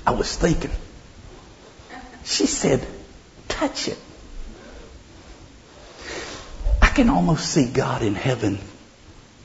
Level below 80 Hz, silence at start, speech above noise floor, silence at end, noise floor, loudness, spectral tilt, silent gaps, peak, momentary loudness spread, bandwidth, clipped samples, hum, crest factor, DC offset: -30 dBFS; 0 s; 26 dB; 0.25 s; -47 dBFS; -22 LUFS; -4.5 dB/octave; none; 0 dBFS; 25 LU; 8 kHz; under 0.1%; none; 24 dB; under 0.1%